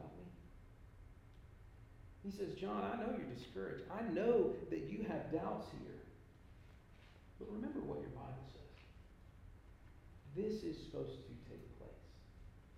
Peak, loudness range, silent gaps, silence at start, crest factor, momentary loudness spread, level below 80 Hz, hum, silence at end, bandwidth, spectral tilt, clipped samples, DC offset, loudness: -24 dBFS; 10 LU; none; 0 s; 22 dB; 21 LU; -62 dBFS; none; 0 s; 14 kHz; -7.5 dB/octave; under 0.1%; under 0.1%; -44 LUFS